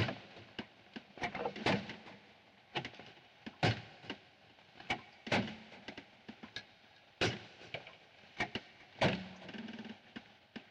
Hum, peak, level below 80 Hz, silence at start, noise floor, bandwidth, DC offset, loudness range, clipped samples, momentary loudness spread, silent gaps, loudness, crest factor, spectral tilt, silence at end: none; -18 dBFS; -68 dBFS; 0 s; -63 dBFS; 11 kHz; under 0.1%; 3 LU; under 0.1%; 21 LU; none; -40 LUFS; 24 dB; -5 dB/octave; 0.05 s